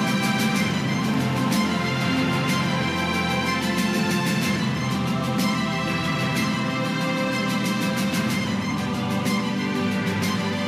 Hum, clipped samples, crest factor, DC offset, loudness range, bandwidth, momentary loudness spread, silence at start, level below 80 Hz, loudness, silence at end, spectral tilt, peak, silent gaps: none; under 0.1%; 12 dB; under 0.1%; 1 LU; 15.5 kHz; 2 LU; 0 s; -52 dBFS; -23 LUFS; 0 s; -5 dB/octave; -12 dBFS; none